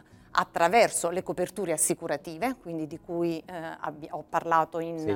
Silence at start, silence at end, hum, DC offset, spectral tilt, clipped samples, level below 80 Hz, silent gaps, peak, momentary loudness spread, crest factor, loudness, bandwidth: 0.35 s; 0 s; none; under 0.1%; -3.5 dB/octave; under 0.1%; -64 dBFS; none; -8 dBFS; 13 LU; 20 dB; -28 LUFS; 18 kHz